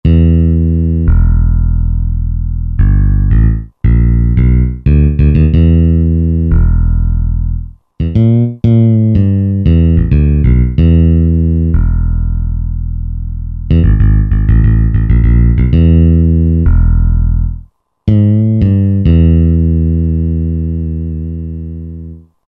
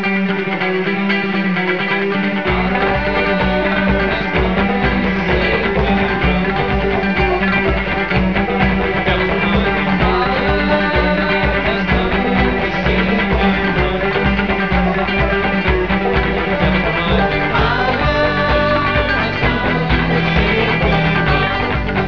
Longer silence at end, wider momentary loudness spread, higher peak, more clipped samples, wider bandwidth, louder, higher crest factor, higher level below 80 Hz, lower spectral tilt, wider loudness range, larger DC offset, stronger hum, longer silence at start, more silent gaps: first, 0.3 s vs 0 s; first, 11 LU vs 2 LU; about the same, 0 dBFS vs 0 dBFS; neither; second, 3.5 kHz vs 5.4 kHz; first, -11 LUFS vs -15 LUFS; second, 8 dB vs 16 dB; first, -12 dBFS vs -26 dBFS; first, -12 dB/octave vs -7.5 dB/octave; about the same, 3 LU vs 1 LU; second, under 0.1% vs 1%; neither; about the same, 0.05 s vs 0 s; neither